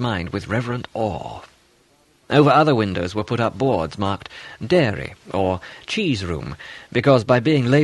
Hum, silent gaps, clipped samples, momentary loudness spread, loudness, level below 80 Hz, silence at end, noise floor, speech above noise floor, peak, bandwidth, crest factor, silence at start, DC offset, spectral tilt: none; none; under 0.1%; 15 LU; -20 LUFS; -48 dBFS; 0 s; -58 dBFS; 38 dB; -2 dBFS; 11.5 kHz; 18 dB; 0 s; under 0.1%; -7 dB/octave